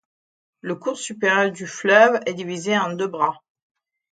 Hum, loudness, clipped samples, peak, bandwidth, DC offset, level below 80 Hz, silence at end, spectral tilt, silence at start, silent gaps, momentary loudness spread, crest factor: none; -20 LUFS; under 0.1%; 0 dBFS; 9.2 kHz; under 0.1%; -74 dBFS; 0.8 s; -4 dB/octave; 0.65 s; none; 13 LU; 22 dB